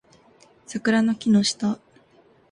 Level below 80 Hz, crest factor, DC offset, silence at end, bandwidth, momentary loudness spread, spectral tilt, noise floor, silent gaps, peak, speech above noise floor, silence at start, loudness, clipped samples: -64 dBFS; 16 dB; under 0.1%; 0.75 s; 11 kHz; 13 LU; -4.5 dB/octave; -57 dBFS; none; -8 dBFS; 36 dB; 0.7 s; -22 LUFS; under 0.1%